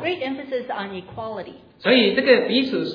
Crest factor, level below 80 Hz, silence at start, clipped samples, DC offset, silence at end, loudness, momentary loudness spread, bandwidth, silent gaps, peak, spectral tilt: 18 dB; -62 dBFS; 0 s; under 0.1%; under 0.1%; 0 s; -20 LUFS; 16 LU; 5.2 kHz; none; -2 dBFS; -6.5 dB/octave